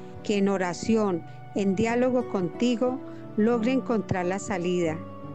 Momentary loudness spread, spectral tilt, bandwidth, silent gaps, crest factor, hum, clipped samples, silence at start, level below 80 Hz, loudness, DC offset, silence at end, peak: 6 LU; -6 dB/octave; 9 kHz; none; 14 dB; none; under 0.1%; 0 s; -58 dBFS; -26 LUFS; 0.6%; 0 s; -12 dBFS